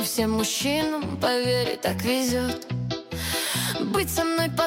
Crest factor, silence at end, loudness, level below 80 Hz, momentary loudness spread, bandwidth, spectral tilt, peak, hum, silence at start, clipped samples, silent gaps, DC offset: 16 dB; 0 s; -25 LUFS; -48 dBFS; 6 LU; 17 kHz; -4 dB/octave; -10 dBFS; none; 0 s; under 0.1%; none; under 0.1%